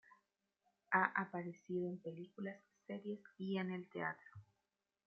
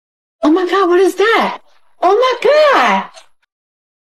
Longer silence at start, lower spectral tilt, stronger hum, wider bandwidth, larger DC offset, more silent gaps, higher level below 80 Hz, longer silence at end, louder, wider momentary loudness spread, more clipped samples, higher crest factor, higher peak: second, 0.1 s vs 0.4 s; about the same, -5 dB/octave vs -4 dB/octave; neither; second, 6.4 kHz vs 13.5 kHz; second, under 0.1% vs 0.5%; neither; second, -90 dBFS vs -64 dBFS; second, 0.65 s vs 1 s; second, -43 LUFS vs -12 LUFS; first, 16 LU vs 9 LU; neither; first, 26 dB vs 12 dB; second, -18 dBFS vs -2 dBFS